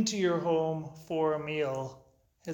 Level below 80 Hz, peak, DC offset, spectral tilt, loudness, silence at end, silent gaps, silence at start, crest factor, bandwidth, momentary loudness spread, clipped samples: -68 dBFS; -16 dBFS; under 0.1%; -5 dB/octave; -31 LUFS; 0 s; none; 0 s; 14 dB; 19 kHz; 11 LU; under 0.1%